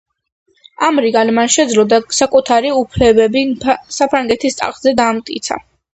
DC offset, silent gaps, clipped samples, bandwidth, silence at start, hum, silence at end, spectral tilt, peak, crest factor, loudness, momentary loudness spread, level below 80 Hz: under 0.1%; none; under 0.1%; 9 kHz; 0.8 s; none; 0.35 s; -3.5 dB/octave; 0 dBFS; 14 dB; -13 LUFS; 7 LU; -40 dBFS